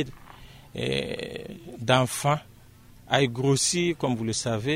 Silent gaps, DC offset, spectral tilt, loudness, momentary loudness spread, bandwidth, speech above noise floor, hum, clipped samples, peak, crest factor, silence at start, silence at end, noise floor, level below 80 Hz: none; under 0.1%; -4 dB/octave; -26 LUFS; 13 LU; 16 kHz; 25 dB; none; under 0.1%; -4 dBFS; 24 dB; 0 s; 0 s; -51 dBFS; -54 dBFS